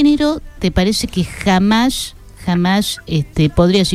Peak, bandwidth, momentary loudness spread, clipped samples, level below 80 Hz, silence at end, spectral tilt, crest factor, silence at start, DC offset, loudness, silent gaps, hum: -2 dBFS; 15.5 kHz; 8 LU; under 0.1%; -32 dBFS; 0 s; -5.5 dB/octave; 14 dB; 0 s; under 0.1%; -16 LUFS; none; none